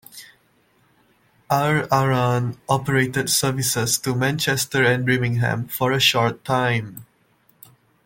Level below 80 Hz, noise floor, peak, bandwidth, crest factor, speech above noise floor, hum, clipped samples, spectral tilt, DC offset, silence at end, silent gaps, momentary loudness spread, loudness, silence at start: -56 dBFS; -61 dBFS; -4 dBFS; 17 kHz; 18 dB; 40 dB; none; under 0.1%; -4 dB/octave; under 0.1%; 1 s; none; 6 LU; -20 LUFS; 0.15 s